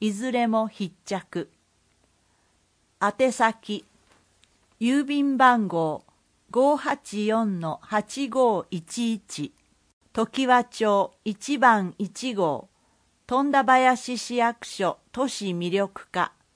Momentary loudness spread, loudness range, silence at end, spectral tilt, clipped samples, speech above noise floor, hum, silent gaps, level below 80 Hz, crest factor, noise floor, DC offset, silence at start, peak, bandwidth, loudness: 14 LU; 6 LU; 0.25 s; -4.5 dB/octave; under 0.1%; 43 dB; none; 9.93-10.01 s; -68 dBFS; 20 dB; -67 dBFS; under 0.1%; 0 s; -4 dBFS; 10.5 kHz; -24 LUFS